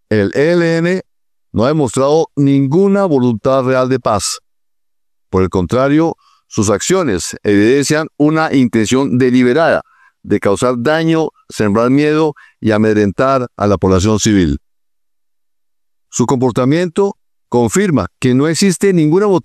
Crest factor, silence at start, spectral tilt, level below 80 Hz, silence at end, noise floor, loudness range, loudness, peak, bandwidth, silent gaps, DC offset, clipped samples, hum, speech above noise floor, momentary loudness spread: 12 dB; 0.1 s; -5.5 dB/octave; -40 dBFS; 0.05 s; -83 dBFS; 3 LU; -13 LUFS; -2 dBFS; 13.5 kHz; none; under 0.1%; under 0.1%; none; 70 dB; 7 LU